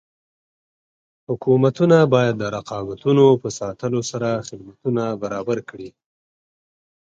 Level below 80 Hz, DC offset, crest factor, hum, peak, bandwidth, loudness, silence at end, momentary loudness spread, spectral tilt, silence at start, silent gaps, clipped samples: -58 dBFS; under 0.1%; 18 dB; none; -2 dBFS; 7.8 kHz; -20 LUFS; 1.1 s; 15 LU; -6.5 dB/octave; 1.3 s; none; under 0.1%